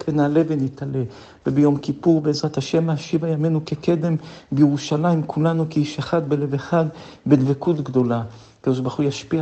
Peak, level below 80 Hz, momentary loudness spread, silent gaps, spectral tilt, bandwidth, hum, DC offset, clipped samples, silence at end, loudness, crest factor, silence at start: -2 dBFS; -58 dBFS; 8 LU; none; -7.5 dB/octave; 8.4 kHz; none; under 0.1%; under 0.1%; 0 s; -21 LUFS; 18 dB; 0 s